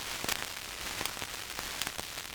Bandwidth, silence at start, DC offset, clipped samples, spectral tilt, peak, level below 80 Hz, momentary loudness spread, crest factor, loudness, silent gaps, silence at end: over 20 kHz; 0 s; under 0.1%; under 0.1%; -1 dB/octave; -10 dBFS; -56 dBFS; 5 LU; 28 dB; -36 LUFS; none; 0 s